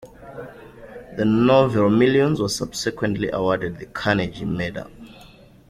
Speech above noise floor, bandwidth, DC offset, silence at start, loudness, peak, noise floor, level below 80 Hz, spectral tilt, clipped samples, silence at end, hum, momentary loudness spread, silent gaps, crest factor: 27 dB; 14.5 kHz; under 0.1%; 0 s; -20 LUFS; -4 dBFS; -47 dBFS; -48 dBFS; -6 dB/octave; under 0.1%; 0.45 s; none; 22 LU; none; 18 dB